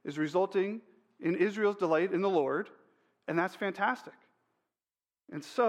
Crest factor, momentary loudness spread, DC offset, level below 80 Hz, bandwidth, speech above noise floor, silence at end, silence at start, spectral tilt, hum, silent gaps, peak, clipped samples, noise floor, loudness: 18 dB; 16 LU; under 0.1%; -86 dBFS; 12.5 kHz; over 59 dB; 0 s; 0.05 s; -6.5 dB/octave; none; none; -14 dBFS; under 0.1%; under -90 dBFS; -31 LUFS